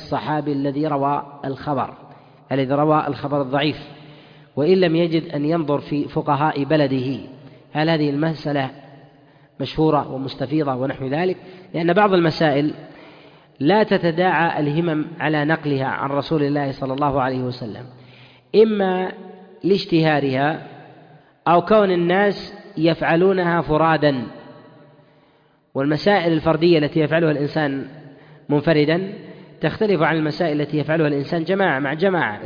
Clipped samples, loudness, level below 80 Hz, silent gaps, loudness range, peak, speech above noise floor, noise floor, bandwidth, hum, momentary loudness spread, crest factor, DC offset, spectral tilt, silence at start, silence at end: under 0.1%; -20 LUFS; -52 dBFS; none; 4 LU; -4 dBFS; 38 dB; -57 dBFS; 5.2 kHz; none; 12 LU; 16 dB; under 0.1%; -8.5 dB/octave; 0 s; 0 s